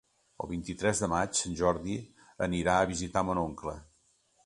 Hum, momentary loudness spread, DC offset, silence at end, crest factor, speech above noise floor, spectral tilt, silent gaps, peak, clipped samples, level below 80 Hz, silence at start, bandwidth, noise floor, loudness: none; 12 LU; under 0.1%; 0.6 s; 22 dB; 39 dB; -4.5 dB/octave; none; -10 dBFS; under 0.1%; -50 dBFS; 0.4 s; 11.5 kHz; -69 dBFS; -31 LUFS